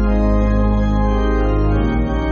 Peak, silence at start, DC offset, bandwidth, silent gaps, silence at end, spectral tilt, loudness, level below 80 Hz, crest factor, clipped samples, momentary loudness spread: -4 dBFS; 0 s; under 0.1%; 6.6 kHz; none; 0 s; -7.5 dB/octave; -17 LUFS; -18 dBFS; 10 dB; under 0.1%; 2 LU